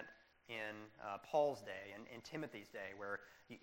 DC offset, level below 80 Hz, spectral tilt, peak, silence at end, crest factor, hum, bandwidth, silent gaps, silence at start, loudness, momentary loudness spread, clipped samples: under 0.1%; -82 dBFS; -5 dB/octave; -24 dBFS; 0.05 s; 22 dB; none; 16 kHz; none; 0 s; -45 LUFS; 15 LU; under 0.1%